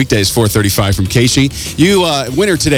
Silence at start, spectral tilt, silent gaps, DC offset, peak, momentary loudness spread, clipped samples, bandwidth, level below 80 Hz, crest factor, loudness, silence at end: 0 s; -4.5 dB/octave; none; under 0.1%; 0 dBFS; 3 LU; under 0.1%; 19 kHz; -30 dBFS; 12 dB; -12 LUFS; 0 s